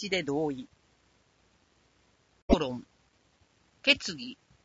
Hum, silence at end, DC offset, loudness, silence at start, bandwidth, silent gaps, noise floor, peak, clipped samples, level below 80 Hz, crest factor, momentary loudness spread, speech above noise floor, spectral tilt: none; 0.3 s; under 0.1%; -29 LUFS; 0 s; 8 kHz; 2.42-2.48 s; -68 dBFS; -8 dBFS; under 0.1%; -48 dBFS; 26 dB; 19 LU; 38 dB; -4 dB/octave